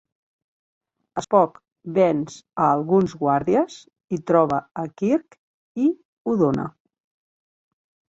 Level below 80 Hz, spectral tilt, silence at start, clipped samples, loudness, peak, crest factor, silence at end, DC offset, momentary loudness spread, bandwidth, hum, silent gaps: -60 dBFS; -7.5 dB/octave; 1.15 s; under 0.1%; -22 LUFS; -4 dBFS; 20 dB; 1.4 s; under 0.1%; 13 LU; 8 kHz; none; 1.72-1.76 s, 5.39-5.75 s, 6.05-6.25 s